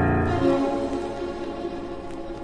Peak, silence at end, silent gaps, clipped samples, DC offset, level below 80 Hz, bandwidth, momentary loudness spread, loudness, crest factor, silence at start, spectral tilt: -8 dBFS; 0 s; none; under 0.1%; under 0.1%; -40 dBFS; 10 kHz; 13 LU; -26 LUFS; 16 dB; 0 s; -7.5 dB/octave